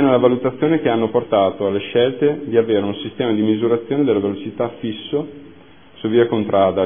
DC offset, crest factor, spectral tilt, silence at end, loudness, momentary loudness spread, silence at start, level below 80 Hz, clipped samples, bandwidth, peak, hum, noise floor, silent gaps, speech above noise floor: 0.4%; 18 dB; -11 dB/octave; 0 s; -18 LUFS; 8 LU; 0 s; -58 dBFS; under 0.1%; 3.6 kHz; 0 dBFS; none; -45 dBFS; none; 27 dB